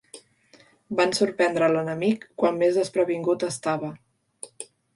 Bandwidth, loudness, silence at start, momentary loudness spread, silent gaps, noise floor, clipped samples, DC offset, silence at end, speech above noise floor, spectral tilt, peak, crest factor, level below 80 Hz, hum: 11.5 kHz; -24 LUFS; 0.15 s; 17 LU; none; -57 dBFS; under 0.1%; under 0.1%; 0.3 s; 34 dB; -5 dB/octave; -8 dBFS; 16 dB; -70 dBFS; none